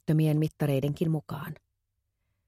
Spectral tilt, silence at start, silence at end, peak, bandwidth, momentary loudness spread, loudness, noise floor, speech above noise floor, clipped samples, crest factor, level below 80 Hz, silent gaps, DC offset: -8 dB/octave; 0.1 s; 0.95 s; -16 dBFS; 15 kHz; 15 LU; -28 LUFS; -80 dBFS; 53 dB; under 0.1%; 14 dB; -60 dBFS; none; under 0.1%